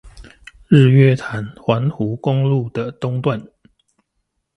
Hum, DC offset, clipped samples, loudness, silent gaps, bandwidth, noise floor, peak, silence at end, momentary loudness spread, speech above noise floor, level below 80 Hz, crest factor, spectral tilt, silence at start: none; under 0.1%; under 0.1%; -17 LUFS; none; 8.2 kHz; -72 dBFS; 0 dBFS; 1.1 s; 13 LU; 56 dB; -48 dBFS; 18 dB; -8.5 dB/octave; 0.05 s